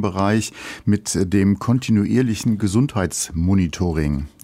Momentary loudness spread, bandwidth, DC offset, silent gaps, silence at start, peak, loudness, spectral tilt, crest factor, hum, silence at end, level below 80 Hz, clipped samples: 5 LU; 16 kHz; under 0.1%; none; 0 s; -6 dBFS; -20 LUFS; -6 dB/octave; 14 dB; none; 0.15 s; -40 dBFS; under 0.1%